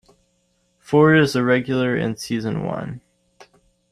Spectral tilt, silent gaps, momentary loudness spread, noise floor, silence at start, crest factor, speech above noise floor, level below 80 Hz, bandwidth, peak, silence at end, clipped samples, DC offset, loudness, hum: -6.5 dB/octave; none; 15 LU; -66 dBFS; 0.9 s; 18 dB; 47 dB; -56 dBFS; 13.5 kHz; -4 dBFS; 0.95 s; under 0.1%; under 0.1%; -19 LUFS; none